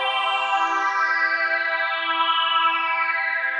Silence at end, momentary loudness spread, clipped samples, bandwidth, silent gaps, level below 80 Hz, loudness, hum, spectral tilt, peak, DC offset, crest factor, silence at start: 0 s; 3 LU; under 0.1%; 10 kHz; none; under -90 dBFS; -20 LUFS; none; 3 dB/octave; -8 dBFS; under 0.1%; 14 dB; 0 s